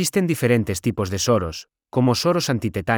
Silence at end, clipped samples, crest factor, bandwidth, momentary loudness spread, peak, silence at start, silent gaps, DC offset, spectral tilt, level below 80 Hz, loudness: 0 s; under 0.1%; 16 dB; over 20 kHz; 7 LU; -4 dBFS; 0 s; none; under 0.1%; -5 dB/octave; -50 dBFS; -21 LUFS